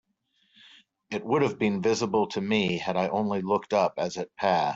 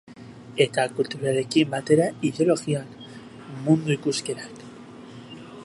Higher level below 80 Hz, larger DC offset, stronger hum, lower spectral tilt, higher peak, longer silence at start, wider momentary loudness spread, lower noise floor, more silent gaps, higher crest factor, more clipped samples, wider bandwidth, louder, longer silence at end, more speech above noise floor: about the same, -66 dBFS vs -66 dBFS; neither; neither; about the same, -5.5 dB/octave vs -5.5 dB/octave; second, -10 dBFS vs -4 dBFS; first, 1.1 s vs 0.1 s; second, 5 LU vs 22 LU; first, -71 dBFS vs -43 dBFS; neither; about the same, 18 dB vs 20 dB; neither; second, 8 kHz vs 11.5 kHz; second, -27 LUFS vs -24 LUFS; about the same, 0 s vs 0 s; first, 45 dB vs 20 dB